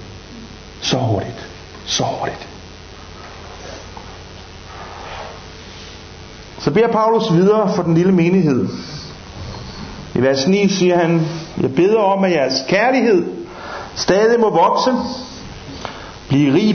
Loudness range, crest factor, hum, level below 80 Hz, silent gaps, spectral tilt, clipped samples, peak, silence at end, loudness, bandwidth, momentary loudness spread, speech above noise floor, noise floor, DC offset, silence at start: 17 LU; 16 dB; none; -42 dBFS; none; -5.5 dB/octave; under 0.1%; -2 dBFS; 0 s; -16 LUFS; 6.6 kHz; 22 LU; 22 dB; -36 dBFS; under 0.1%; 0 s